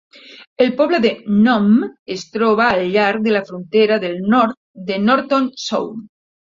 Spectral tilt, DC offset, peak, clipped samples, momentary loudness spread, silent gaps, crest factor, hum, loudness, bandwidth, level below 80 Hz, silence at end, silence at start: -6 dB/octave; under 0.1%; -2 dBFS; under 0.1%; 11 LU; 0.47-0.56 s, 1.99-2.06 s, 4.57-4.74 s; 16 dB; none; -16 LUFS; 7.4 kHz; -58 dBFS; 0.4 s; 0.3 s